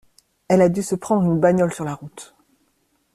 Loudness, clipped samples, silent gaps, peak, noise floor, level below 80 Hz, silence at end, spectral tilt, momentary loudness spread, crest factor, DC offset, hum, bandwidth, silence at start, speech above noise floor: -19 LUFS; under 0.1%; none; -4 dBFS; -66 dBFS; -56 dBFS; 0.9 s; -7 dB/octave; 18 LU; 18 dB; under 0.1%; none; 14 kHz; 0.5 s; 48 dB